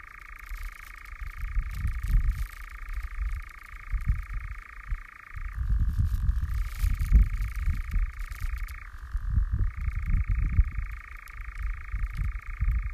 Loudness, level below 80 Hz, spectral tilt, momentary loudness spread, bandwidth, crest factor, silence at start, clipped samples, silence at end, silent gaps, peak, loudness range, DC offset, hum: -33 LUFS; -30 dBFS; -6.5 dB/octave; 14 LU; 14.5 kHz; 20 dB; 0.05 s; under 0.1%; 0 s; none; -10 dBFS; 5 LU; under 0.1%; none